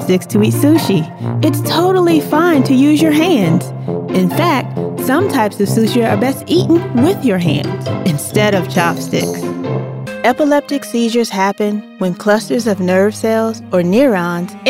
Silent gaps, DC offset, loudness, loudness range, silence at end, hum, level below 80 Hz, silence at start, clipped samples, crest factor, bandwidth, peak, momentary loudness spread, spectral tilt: none; under 0.1%; -14 LUFS; 4 LU; 0 s; none; -60 dBFS; 0 s; under 0.1%; 14 dB; 16.5 kHz; 0 dBFS; 8 LU; -6 dB/octave